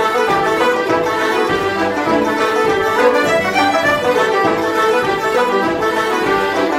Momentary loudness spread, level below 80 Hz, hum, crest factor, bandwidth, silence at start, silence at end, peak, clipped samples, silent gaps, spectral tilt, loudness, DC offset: 3 LU; -48 dBFS; none; 14 dB; 16.5 kHz; 0 s; 0 s; 0 dBFS; under 0.1%; none; -4 dB/octave; -15 LUFS; under 0.1%